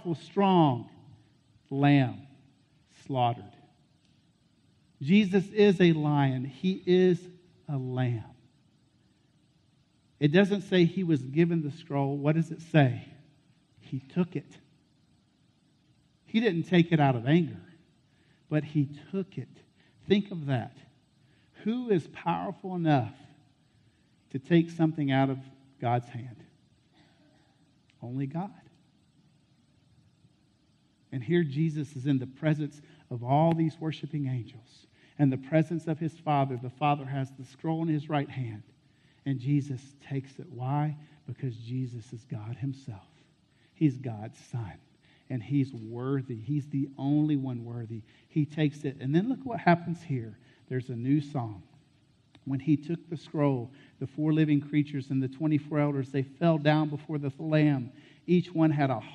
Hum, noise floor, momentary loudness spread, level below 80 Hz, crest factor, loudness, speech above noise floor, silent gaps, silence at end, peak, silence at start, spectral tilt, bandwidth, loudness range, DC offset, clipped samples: none; -67 dBFS; 16 LU; -70 dBFS; 20 dB; -29 LUFS; 38 dB; none; 0 s; -8 dBFS; 0 s; -8.5 dB/octave; 8.8 kHz; 9 LU; under 0.1%; under 0.1%